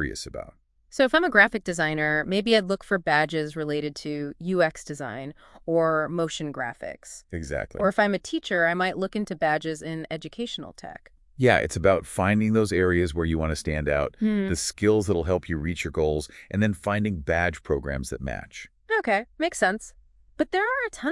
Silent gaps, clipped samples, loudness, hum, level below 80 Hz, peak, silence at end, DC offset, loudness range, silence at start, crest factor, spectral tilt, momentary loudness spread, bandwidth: none; under 0.1%; -25 LUFS; none; -46 dBFS; -4 dBFS; 0 s; under 0.1%; 5 LU; 0 s; 22 dB; -5 dB/octave; 14 LU; 12 kHz